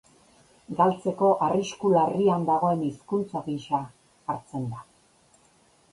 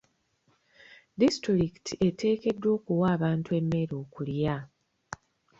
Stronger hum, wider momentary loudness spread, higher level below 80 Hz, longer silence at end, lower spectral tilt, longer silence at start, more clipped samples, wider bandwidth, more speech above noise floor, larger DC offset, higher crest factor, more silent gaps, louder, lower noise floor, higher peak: neither; second, 13 LU vs 18 LU; second, -66 dBFS vs -58 dBFS; first, 1.1 s vs 0.45 s; about the same, -7 dB/octave vs -7 dB/octave; second, 0.7 s vs 0.9 s; neither; first, 11.5 kHz vs 8 kHz; second, 36 dB vs 43 dB; neither; about the same, 18 dB vs 18 dB; neither; about the same, -26 LUFS vs -28 LUFS; second, -61 dBFS vs -70 dBFS; first, -8 dBFS vs -12 dBFS